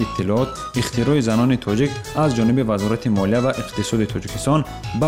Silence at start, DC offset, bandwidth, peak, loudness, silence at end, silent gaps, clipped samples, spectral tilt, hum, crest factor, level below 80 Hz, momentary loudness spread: 0 s; 0.2%; 16 kHz; -8 dBFS; -20 LUFS; 0 s; none; under 0.1%; -6 dB/octave; none; 12 dB; -40 dBFS; 6 LU